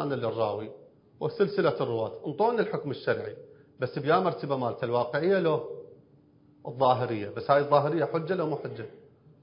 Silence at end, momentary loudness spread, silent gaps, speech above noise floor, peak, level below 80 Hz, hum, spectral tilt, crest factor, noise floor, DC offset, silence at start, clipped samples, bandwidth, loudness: 0.45 s; 16 LU; none; 32 dB; -8 dBFS; -70 dBFS; none; -10.5 dB/octave; 22 dB; -59 dBFS; under 0.1%; 0 s; under 0.1%; 5.4 kHz; -28 LUFS